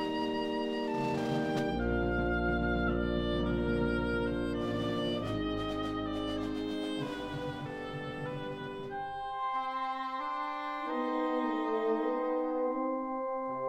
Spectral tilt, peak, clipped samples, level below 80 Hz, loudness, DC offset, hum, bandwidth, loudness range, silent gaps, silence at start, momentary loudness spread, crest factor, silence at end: -7 dB/octave; -20 dBFS; under 0.1%; -46 dBFS; -34 LUFS; under 0.1%; none; 13 kHz; 6 LU; none; 0 s; 8 LU; 14 dB; 0 s